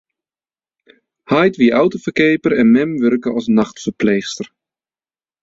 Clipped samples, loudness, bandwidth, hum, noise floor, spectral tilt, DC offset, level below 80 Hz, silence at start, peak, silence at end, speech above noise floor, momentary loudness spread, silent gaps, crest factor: under 0.1%; -15 LUFS; 7.8 kHz; none; under -90 dBFS; -6 dB/octave; under 0.1%; -56 dBFS; 1.3 s; -2 dBFS; 0.95 s; over 76 dB; 9 LU; none; 16 dB